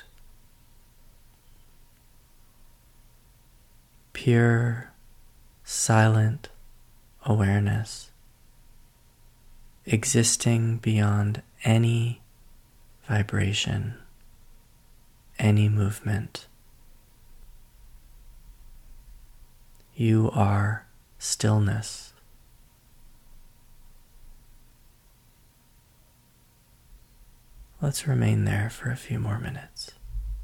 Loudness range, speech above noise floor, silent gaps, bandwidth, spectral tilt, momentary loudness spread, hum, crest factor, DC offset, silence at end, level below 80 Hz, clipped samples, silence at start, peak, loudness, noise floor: 7 LU; 36 dB; none; 15 kHz; -5 dB/octave; 18 LU; none; 20 dB; under 0.1%; 0 s; -48 dBFS; under 0.1%; 4.15 s; -8 dBFS; -25 LUFS; -59 dBFS